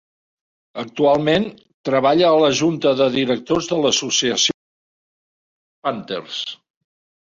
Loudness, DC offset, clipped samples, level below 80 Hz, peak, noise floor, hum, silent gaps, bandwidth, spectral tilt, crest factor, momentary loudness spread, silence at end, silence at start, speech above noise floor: -18 LUFS; under 0.1%; under 0.1%; -58 dBFS; -2 dBFS; under -90 dBFS; none; 1.74-1.84 s, 4.54-5.82 s; 7.6 kHz; -3.5 dB/octave; 18 dB; 15 LU; 0.65 s; 0.75 s; over 72 dB